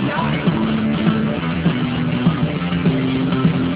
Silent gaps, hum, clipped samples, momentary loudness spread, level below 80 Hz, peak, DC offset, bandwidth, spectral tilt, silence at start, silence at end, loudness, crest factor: none; none; under 0.1%; 3 LU; -38 dBFS; -2 dBFS; under 0.1%; 4 kHz; -11.5 dB/octave; 0 s; 0 s; -18 LUFS; 16 dB